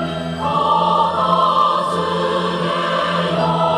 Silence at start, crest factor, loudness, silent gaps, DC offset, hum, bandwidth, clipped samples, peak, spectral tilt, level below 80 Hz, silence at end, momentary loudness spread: 0 s; 14 dB; -17 LUFS; none; under 0.1%; none; 11 kHz; under 0.1%; -2 dBFS; -5.5 dB/octave; -50 dBFS; 0 s; 5 LU